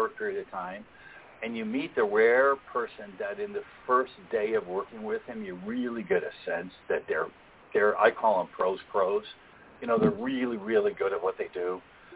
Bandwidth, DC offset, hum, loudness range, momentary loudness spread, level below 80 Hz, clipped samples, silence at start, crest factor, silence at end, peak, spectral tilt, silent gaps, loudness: 4 kHz; under 0.1%; none; 4 LU; 15 LU; -66 dBFS; under 0.1%; 0 s; 22 dB; 0 s; -8 dBFS; -9 dB/octave; none; -29 LUFS